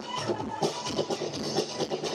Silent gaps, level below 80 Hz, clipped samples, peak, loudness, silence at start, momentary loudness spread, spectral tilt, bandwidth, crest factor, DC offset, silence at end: none; -66 dBFS; under 0.1%; -14 dBFS; -31 LUFS; 0 s; 2 LU; -4 dB/octave; 15 kHz; 18 dB; under 0.1%; 0 s